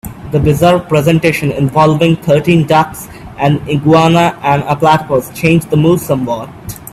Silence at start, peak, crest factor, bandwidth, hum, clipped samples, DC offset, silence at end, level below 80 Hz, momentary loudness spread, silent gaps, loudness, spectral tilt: 0.05 s; 0 dBFS; 12 dB; 15 kHz; none; under 0.1%; under 0.1%; 0.05 s; -38 dBFS; 9 LU; none; -11 LUFS; -6.5 dB/octave